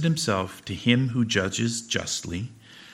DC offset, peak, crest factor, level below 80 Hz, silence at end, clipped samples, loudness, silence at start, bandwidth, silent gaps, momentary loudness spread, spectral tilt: under 0.1%; -6 dBFS; 20 dB; -56 dBFS; 0 s; under 0.1%; -26 LUFS; 0 s; 15.5 kHz; none; 11 LU; -4.5 dB/octave